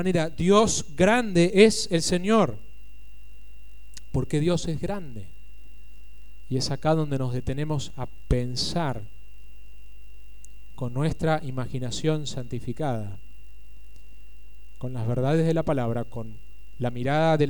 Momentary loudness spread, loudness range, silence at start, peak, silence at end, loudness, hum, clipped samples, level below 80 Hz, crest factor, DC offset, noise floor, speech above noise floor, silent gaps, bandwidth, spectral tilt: 16 LU; 9 LU; 0 s; -4 dBFS; 0 s; -25 LUFS; 50 Hz at -50 dBFS; under 0.1%; -42 dBFS; 22 dB; 3%; -49 dBFS; 25 dB; none; 17 kHz; -5.5 dB/octave